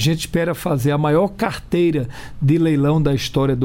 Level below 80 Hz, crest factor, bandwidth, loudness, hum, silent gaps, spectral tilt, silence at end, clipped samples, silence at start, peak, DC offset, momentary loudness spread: -38 dBFS; 12 dB; 17 kHz; -18 LUFS; none; none; -6.5 dB/octave; 0 s; under 0.1%; 0 s; -6 dBFS; under 0.1%; 6 LU